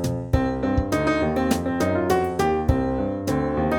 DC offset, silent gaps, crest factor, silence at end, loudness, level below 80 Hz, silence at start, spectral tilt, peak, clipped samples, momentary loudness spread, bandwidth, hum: under 0.1%; none; 18 dB; 0 s; -23 LUFS; -34 dBFS; 0 s; -6.5 dB/octave; -4 dBFS; under 0.1%; 3 LU; 18 kHz; none